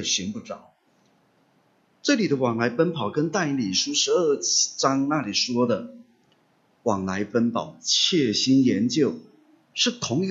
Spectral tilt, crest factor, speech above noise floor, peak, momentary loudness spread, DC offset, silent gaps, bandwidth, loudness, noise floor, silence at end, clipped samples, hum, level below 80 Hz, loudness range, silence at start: -3.5 dB/octave; 20 dB; 41 dB; -6 dBFS; 10 LU; under 0.1%; none; 8 kHz; -23 LUFS; -64 dBFS; 0 s; under 0.1%; none; -68 dBFS; 4 LU; 0 s